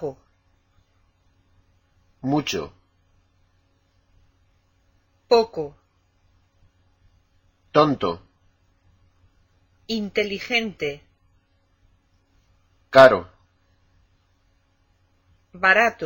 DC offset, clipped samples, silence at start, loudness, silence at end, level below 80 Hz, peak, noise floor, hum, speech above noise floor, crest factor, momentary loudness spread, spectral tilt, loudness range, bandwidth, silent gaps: under 0.1%; under 0.1%; 0 s; -20 LUFS; 0 s; -58 dBFS; 0 dBFS; -64 dBFS; none; 45 dB; 26 dB; 20 LU; -5 dB/octave; 11 LU; 16.5 kHz; none